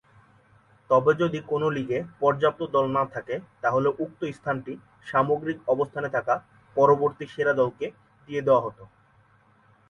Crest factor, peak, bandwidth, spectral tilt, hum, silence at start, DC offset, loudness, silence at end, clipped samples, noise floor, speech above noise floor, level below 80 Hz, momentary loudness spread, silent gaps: 20 dB; -6 dBFS; 7 kHz; -7.5 dB/octave; none; 0.9 s; under 0.1%; -25 LUFS; 1.05 s; under 0.1%; -60 dBFS; 35 dB; -64 dBFS; 11 LU; none